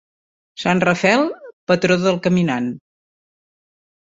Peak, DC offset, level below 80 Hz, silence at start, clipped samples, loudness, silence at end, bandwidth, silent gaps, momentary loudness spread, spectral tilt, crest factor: -2 dBFS; under 0.1%; -58 dBFS; 0.55 s; under 0.1%; -18 LUFS; 1.3 s; 7.8 kHz; 1.53-1.67 s; 10 LU; -6 dB/octave; 18 dB